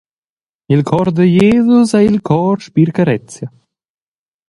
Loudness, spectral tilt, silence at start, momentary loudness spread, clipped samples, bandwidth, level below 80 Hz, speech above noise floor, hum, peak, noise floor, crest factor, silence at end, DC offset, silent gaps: -12 LUFS; -7.5 dB/octave; 0.7 s; 11 LU; under 0.1%; 11.5 kHz; -46 dBFS; over 79 dB; none; 0 dBFS; under -90 dBFS; 14 dB; 1 s; under 0.1%; none